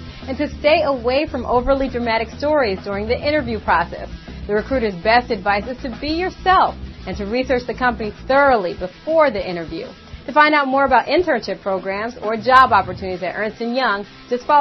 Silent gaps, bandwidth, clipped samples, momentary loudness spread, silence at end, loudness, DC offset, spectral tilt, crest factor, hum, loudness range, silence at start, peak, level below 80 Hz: none; 7.4 kHz; under 0.1%; 13 LU; 0 s; -18 LUFS; under 0.1%; -6 dB/octave; 18 dB; none; 4 LU; 0 s; 0 dBFS; -38 dBFS